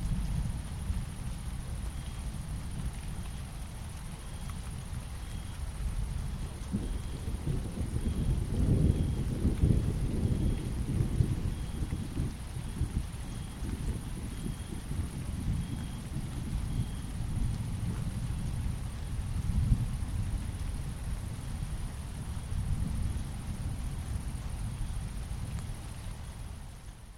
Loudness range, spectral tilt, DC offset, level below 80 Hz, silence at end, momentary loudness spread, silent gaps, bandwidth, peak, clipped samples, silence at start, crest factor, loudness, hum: 9 LU; -6.5 dB/octave; under 0.1%; -36 dBFS; 0 s; 10 LU; none; 16 kHz; -12 dBFS; under 0.1%; 0 s; 22 dB; -36 LUFS; none